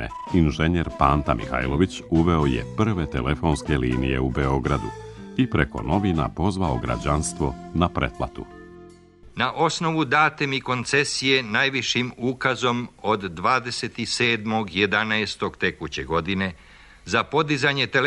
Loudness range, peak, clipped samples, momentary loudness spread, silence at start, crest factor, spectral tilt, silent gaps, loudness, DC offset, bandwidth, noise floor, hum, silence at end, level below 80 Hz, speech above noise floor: 4 LU; -2 dBFS; under 0.1%; 7 LU; 0 s; 22 dB; -5 dB/octave; none; -23 LUFS; under 0.1%; 11.5 kHz; -48 dBFS; none; 0 s; -38 dBFS; 25 dB